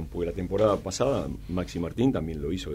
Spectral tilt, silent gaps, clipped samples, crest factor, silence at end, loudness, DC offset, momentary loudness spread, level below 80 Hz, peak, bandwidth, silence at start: -6.5 dB/octave; none; under 0.1%; 16 dB; 0 s; -28 LUFS; under 0.1%; 8 LU; -42 dBFS; -10 dBFS; 15.5 kHz; 0 s